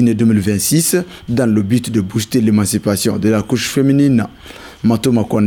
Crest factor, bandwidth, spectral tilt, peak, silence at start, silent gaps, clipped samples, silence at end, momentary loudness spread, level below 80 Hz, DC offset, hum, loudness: 12 dB; 20 kHz; -5.5 dB/octave; -2 dBFS; 0 s; none; under 0.1%; 0 s; 6 LU; -46 dBFS; under 0.1%; none; -15 LUFS